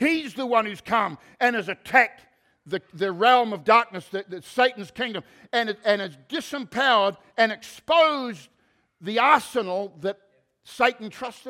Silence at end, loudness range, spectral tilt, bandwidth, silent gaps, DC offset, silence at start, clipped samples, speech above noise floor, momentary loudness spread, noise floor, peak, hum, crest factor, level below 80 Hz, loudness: 0 s; 2 LU; -4 dB/octave; 16 kHz; none; under 0.1%; 0 s; under 0.1%; 39 dB; 14 LU; -63 dBFS; -2 dBFS; none; 22 dB; -70 dBFS; -23 LUFS